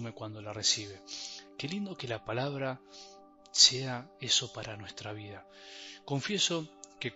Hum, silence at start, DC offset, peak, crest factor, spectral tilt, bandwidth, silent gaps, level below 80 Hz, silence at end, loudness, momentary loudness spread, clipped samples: none; 0 s; under 0.1%; -8 dBFS; 26 dB; -2 dB/octave; 8.2 kHz; none; -70 dBFS; 0 s; -30 LUFS; 22 LU; under 0.1%